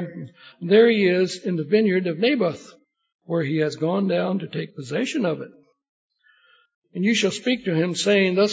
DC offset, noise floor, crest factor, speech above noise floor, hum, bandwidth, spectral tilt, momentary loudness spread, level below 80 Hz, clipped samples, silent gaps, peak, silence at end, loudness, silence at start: under 0.1%; -59 dBFS; 18 dB; 37 dB; none; 8 kHz; -5.5 dB/octave; 16 LU; -72 dBFS; under 0.1%; 3.15-3.19 s, 5.89-6.09 s, 6.74-6.82 s; -4 dBFS; 0 s; -21 LUFS; 0 s